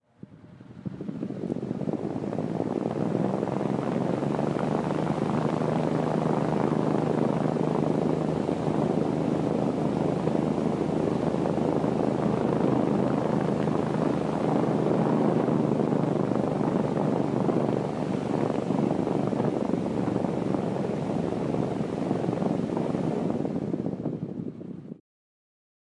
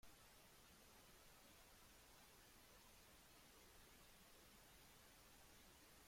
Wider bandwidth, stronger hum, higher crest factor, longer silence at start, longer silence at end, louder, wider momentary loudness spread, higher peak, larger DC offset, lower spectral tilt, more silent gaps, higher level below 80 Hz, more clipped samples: second, 11 kHz vs 16.5 kHz; neither; about the same, 14 dB vs 14 dB; first, 0.3 s vs 0 s; first, 1.05 s vs 0 s; first, -27 LUFS vs -67 LUFS; first, 6 LU vs 0 LU; first, -12 dBFS vs -54 dBFS; neither; first, -8.5 dB/octave vs -2.5 dB/octave; neither; first, -58 dBFS vs -76 dBFS; neither